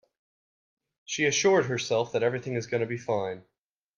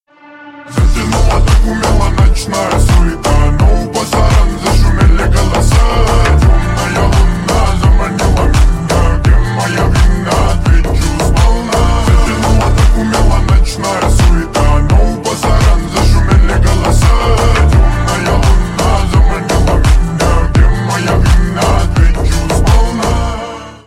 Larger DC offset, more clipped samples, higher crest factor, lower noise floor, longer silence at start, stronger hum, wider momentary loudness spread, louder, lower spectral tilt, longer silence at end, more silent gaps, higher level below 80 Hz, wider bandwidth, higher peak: neither; neither; first, 18 dB vs 8 dB; first, under -90 dBFS vs -35 dBFS; first, 1.1 s vs 0.35 s; neither; first, 11 LU vs 4 LU; second, -27 LUFS vs -11 LUFS; second, -4 dB/octave vs -5.5 dB/octave; first, 0.6 s vs 0.1 s; neither; second, -70 dBFS vs -10 dBFS; second, 7.4 kHz vs 14.5 kHz; second, -10 dBFS vs 0 dBFS